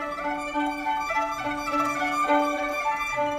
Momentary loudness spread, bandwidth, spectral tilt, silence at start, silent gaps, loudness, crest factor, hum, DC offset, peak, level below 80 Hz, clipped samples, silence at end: 6 LU; 15.5 kHz; -3.5 dB/octave; 0 s; none; -26 LUFS; 18 dB; none; under 0.1%; -8 dBFS; -52 dBFS; under 0.1%; 0 s